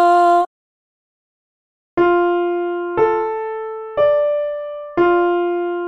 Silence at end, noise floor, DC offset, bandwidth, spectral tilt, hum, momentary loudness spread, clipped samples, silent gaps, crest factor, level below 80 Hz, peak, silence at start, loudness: 0 s; under -90 dBFS; under 0.1%; 9.6 kHz; -6.5 dB/octave; none; 11 LU; under 0.1%; 0.47-1.97 s; 14 dB; -56 dBFS; -4 dBFS; 0 s; -18 LUFS